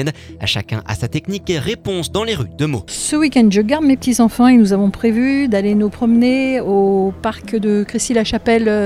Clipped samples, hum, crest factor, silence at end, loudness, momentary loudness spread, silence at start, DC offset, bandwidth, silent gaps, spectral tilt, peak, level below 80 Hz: under 0.1%; none; 14 dB; 0 s; -15 LUFS; 9 LU; 0 s; under 0.1%; 14.5 kHz; none; -5 dB/octave; 0 dBFS; -40 dBFS